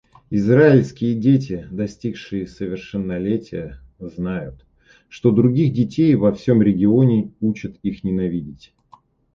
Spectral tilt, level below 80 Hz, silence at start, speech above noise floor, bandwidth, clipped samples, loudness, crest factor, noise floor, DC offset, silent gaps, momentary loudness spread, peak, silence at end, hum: -9 dB/octave; -48 dBFS; 0.3 s; 34 dB; 7.4 kHz; under 0.1%; -19 LUFS; 18 dB; -53 dBFS; under 0.1%; none; 14 LU; -2 dBFS; 0.8 s; none